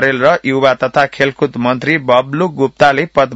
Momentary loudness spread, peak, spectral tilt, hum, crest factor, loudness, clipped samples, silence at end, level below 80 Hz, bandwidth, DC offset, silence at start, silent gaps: 4 LU; 0 dBFS; -6 dB/octave; none; 12 dB; -13 LUFS; 0.2%; 0 s; -50 dBFS; 8.2 kHz; under 0.1%; 0 s; none